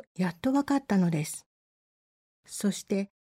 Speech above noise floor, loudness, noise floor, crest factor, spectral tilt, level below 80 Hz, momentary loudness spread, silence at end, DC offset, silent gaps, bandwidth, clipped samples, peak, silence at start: over 62 dB; -29 LUFS; under -90 dBFS; 16 dB; -6 dB/octave; -68 dBFS; 10 LU; 0.15 s; under 0.1%; 1.46-2.43 s; 16 kHz; under 0.1%; -14 dBFS; 0.2 s